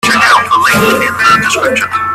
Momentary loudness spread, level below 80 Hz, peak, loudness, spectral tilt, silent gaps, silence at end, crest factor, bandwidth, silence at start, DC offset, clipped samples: 4 LU; -44 dBFS; 0 dBFS; -8 LUFS; -3 dB/octave; none; 0 s; 10 dB; 16.5 kHz; 0.05 s; under 0.1%; 0.3%